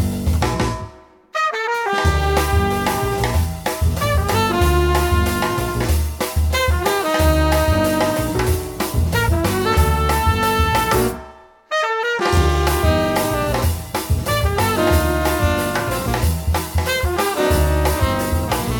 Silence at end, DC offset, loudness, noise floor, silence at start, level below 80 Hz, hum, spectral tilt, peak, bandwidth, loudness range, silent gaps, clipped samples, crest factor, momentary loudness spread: 0 s; under 0.1%; -18 LUFS; -41 dBFS; 0 s; -24 dBFS; none; -5 dB/octave; -2 dBFS; 19 kHz; 1 LU; none; under 0.1%; 16 dB; 5 LU